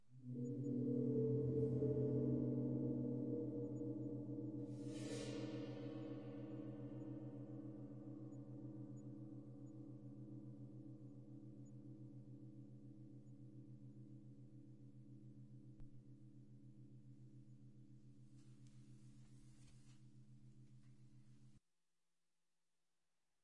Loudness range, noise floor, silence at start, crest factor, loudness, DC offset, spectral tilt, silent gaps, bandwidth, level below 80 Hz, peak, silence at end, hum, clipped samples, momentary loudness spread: 23 LU; under -90 dBFS; 0.1 s; 20 dB; -47 LUFS; under 0.1%; -8.5 dB/octave; none; 10.5 kHz; -76 dBFS; -30 dBFS; 0 s; none; under 0.1%; 24 LU